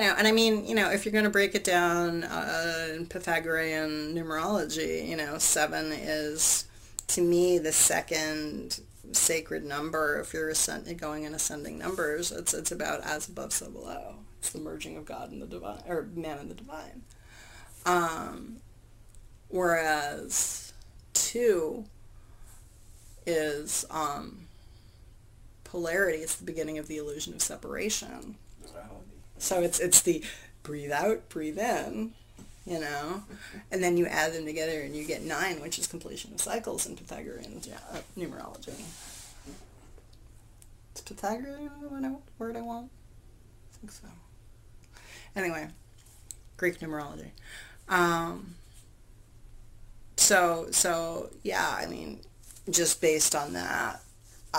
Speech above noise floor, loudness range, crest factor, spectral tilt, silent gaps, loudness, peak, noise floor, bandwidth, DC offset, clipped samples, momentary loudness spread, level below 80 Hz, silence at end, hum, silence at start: 23 dB; 14 LU; 28 dB; -2.5 dB/octave; none; -29 LUFS; -4 dBFS; -53 dBFS; 16 kHz; under 0.1%; under 0.1%; 20 LU; -54 dBFS; 0 s; none; 0 s